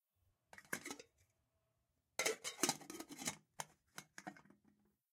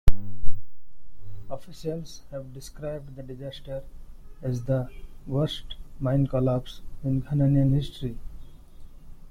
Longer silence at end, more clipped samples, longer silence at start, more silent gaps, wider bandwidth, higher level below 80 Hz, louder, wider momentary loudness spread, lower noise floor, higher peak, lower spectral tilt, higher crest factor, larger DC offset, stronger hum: first, 0.7 s vs 0.15 s; neither; first, 0.55 s vs 0.05 s; neither; first, 16 kHz vs 10.5 kHz; second, -88 dBFS vs -36 dBFS; second, -44 LUFS vs -29 LUFS; about the same, 18 LU vs 20 LU; first, -85 dBFS vs -45 dBFS; second, -20 dBFS vs -2 dBFS; second, -1.5 dB/octave vs -8 dB/octave; first, 28 dB vs 20 dB; neither; neither